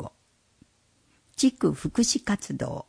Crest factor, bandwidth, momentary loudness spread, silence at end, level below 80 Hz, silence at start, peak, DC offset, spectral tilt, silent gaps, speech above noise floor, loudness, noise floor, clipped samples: 18 dB; 10.5 kHz; 13 LU; 0.05 s; -54 dBFS; 0 s; -12 dBFS; under 0.1%; -4 dB/octave; none; 40 dB; -26 LUFS; -66 dBFS; under 0.1%